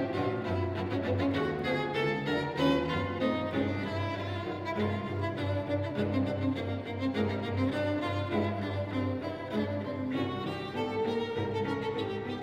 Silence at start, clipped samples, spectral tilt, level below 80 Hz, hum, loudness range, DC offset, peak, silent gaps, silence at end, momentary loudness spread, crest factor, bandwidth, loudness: 0 s; under 0.1%; -7.5 dB/octave; -58 dBFS; none; 3 LU; under 0.1%; -16 dBFS; none; 0 s; 5 LU; 16 dB; 9.6 kHz; -32 LUFS